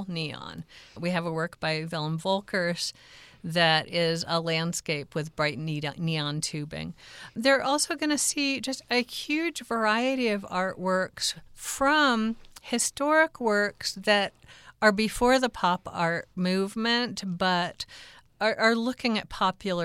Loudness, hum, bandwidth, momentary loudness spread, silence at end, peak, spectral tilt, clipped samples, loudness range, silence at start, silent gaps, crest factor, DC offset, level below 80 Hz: -27 LUFS; none; 16.5 kHz; 12 LU; 0 s; -6 dBFS; -3.5 dB/octave; under 0.1%; 4 LU; 0 s; none; 22 dB; under 0.1%; -58 dBFS